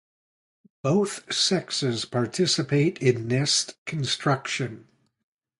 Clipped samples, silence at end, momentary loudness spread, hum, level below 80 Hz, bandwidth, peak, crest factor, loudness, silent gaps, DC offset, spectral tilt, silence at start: under 0.1%; 0.8 s; 8 LU; none; -64 dBFS; 11.5 kHz; -8 dBFS; 18 dB; -25 LUFS; 3.78-3.86 s; under 0.1%; -4 dB/octave; 0.85 s